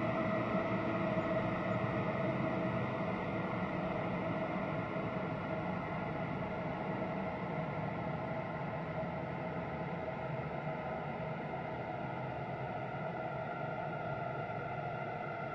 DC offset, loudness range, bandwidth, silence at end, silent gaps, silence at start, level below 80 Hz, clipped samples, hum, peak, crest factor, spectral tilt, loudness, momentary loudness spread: under 0.1%; 5 LU; 7.4 kHz; 0 s; none; 0 s; -62 dBFS; under 0.1%; none; -22 dBFS; 16 dB; -8.5 dB/octave; -38 LUFS; 6 LU